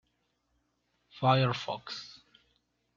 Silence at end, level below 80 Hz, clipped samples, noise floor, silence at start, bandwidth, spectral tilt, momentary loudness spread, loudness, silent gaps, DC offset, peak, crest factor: 0.85 s; -74 dBFS; under 0.1%; -77 dBFS; 1.15 s; 7.4 kHz; -6.5 dB/octave; 16 LU; -30 LUFS; none; under 0.1%; -12 dBFS; 22 dB